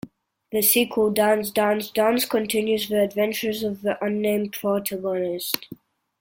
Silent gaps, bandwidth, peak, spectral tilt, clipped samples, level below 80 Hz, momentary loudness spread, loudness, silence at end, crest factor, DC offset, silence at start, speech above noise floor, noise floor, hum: none; 17 kHz; 0 dBFS; -3.5 dB/octave; under 0.1%; -62 dBFS; 7 LU; -23 LUFS; 0.45 s; 22 dB; under 0.1%; 0.05 s; 23 dB; -45 dBFS; none